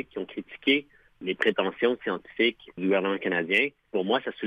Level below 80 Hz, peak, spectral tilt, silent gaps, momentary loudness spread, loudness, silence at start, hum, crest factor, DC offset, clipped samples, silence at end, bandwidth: -70 dBFS; -10 dBFS; -6 dB/octave; none; 10 LU; -27 LUFS; 0 s; none; 18 dB; under 0.1%; under 0.1%; 0 s; 10.5 kHz